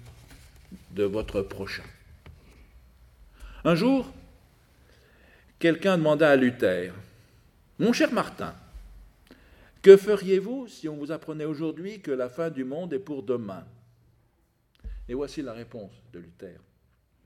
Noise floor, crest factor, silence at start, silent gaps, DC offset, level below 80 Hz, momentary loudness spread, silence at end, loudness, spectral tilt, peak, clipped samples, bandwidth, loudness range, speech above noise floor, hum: -68 dBFS; 26 dB; 0.05 s; none; under 0.1%; -52 dBFS; 22 LU; 0.75 s; -25 LUFS; -6.5 dB/octave; 0 dBFS; under 0.1%; 13.5 kHz; 13 LU; 43 dB; none